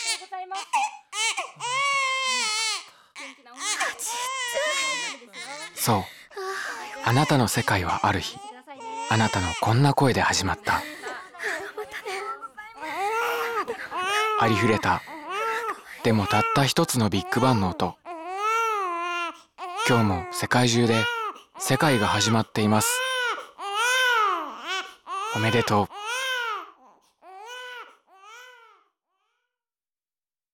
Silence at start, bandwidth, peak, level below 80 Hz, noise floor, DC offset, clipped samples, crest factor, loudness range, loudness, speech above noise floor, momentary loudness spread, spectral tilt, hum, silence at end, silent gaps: 0 s; 17 kHz; -8 dBFS; -58 dBFS; under -90 dBFS; under 0.1%; under 0.1%; 18 dB; 6 LU; -24 LUFS; over 68 dB; 15 LU; -4 dB/octave; none; 2.05 s; none